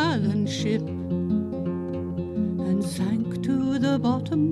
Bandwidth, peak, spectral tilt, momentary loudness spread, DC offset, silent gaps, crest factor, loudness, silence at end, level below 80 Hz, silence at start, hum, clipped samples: 13 kHz; -12 dBFS; -7 dB/octave; 6 LU; under 0.1%; none; 14 dB; -26 LUFS; 0 s; -54 dBFS; 0 s; none; under 0.1%